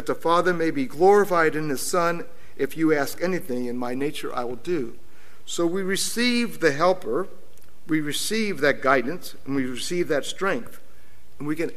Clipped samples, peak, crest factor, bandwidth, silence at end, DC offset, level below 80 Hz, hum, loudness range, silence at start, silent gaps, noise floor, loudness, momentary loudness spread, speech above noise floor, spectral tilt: under 0.1%; -4 dBFS; 20 dB; 16 kHz; 0.05 s; 3%; -58 dBFS; none; 5 LU; 0 s; none; -55 dBFS; -24 LUFS; 10 LU; 31 dB; -4 dB/octave